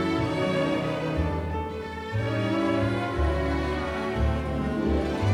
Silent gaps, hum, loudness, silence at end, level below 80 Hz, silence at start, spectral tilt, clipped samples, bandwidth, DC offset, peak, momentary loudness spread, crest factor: none; none; -27 LUFS; 0 s; -34 dBFS; 0 s; -7 dB/octave; under 0.1%; 11.5 kHz; under 0.1%; -14 dBFS; 5 LU; 12 dB